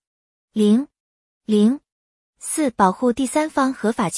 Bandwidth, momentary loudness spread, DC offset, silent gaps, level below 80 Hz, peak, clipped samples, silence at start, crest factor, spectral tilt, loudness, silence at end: 12 kHz; 12 LU; under 0.1%; 1.00-1.41 s, 1.92-2.33 s; -58 dBFS; -4 dBFS; under 0.1%; 0.55 s; 18 dB; -5.5 dB/octave; -20 LUFS; 0 s